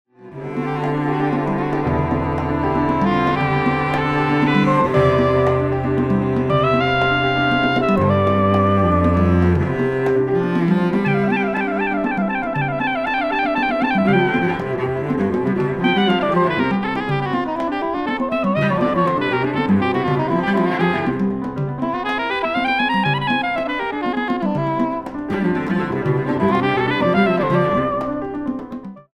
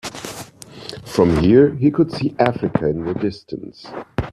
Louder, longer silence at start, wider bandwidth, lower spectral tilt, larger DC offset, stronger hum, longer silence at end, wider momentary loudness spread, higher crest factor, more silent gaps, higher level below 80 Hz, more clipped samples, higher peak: about the same, -18 LUFS vs -18 LUFS; first, 0.2 s vs 0.05 s; second, 10 kHz vs 14 kHz; about the same, -8 dB/octave vs -7 dB/octave; neither; neither; first, 0.15 s vs 0 s; second, 6 LU vs 21 LU; about the same, 14 dB vs 18 dB; neither; about the same, -40 dBFS vs -42 dBFS; neither; second, -4 dBFS vs 0 dBFS